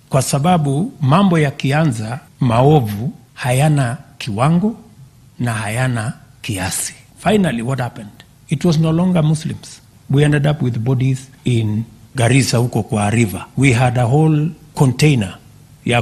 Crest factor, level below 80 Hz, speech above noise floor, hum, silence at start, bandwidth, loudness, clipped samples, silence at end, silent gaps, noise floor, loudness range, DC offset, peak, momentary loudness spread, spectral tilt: 16 dB; -44 dBFS; 28 dB; none; 0.1 s; 14.5 kHz; -16 LUFS; under 0.1%; 0 s; none; -43 dBFS; 5 LU; under 0.1%; 0 dBFS; 12 LU; -6 dB/octave